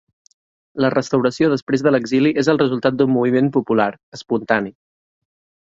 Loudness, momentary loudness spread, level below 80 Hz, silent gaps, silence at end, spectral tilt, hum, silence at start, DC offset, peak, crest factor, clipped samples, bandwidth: -18 LUFS; 8 LU; -60 dBFS; 1.62-1.67 s, 4.03-4.12 s; 0.95 s; -6.5 dB/octave; none; 0.75 s; under 0.1%; -2 dBFS; 18 dB; under 0.1%; 7.8 kHz